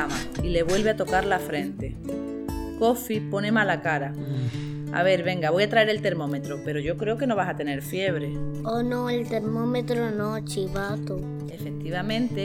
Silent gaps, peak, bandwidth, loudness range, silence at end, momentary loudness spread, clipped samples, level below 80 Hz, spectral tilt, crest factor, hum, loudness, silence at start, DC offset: none; -8 dBFS; 17.5 kHz; 4 LU; 0 s; 10 LU; under 0.1%; -44 dBFS; -6 dB/octave; 18 dB; none; -26 LUFS; 0 s; under 0.1%